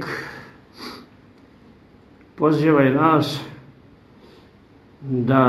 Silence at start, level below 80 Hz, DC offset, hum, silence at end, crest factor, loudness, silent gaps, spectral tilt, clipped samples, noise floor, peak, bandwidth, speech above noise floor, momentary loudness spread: 0 s; -58 dBFS; under 0.1%; none; 0 s; 20 dB; -19 LUFS; none; -7.5 dB/octave; under 0.1%; -50 dBFS; -2 dBFS; 15 kHz; 33 dB; 23 LU